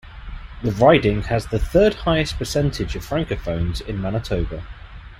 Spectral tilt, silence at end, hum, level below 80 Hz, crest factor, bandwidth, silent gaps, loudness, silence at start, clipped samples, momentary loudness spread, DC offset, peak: -6 dB/octave; 0.05 s; none; -32 dBFS; 18 dB; 16.5 kHz; none; -21 LUFS; 0.05 s; under 0.1%; 20 LU; under 0.1%; -2 dBFS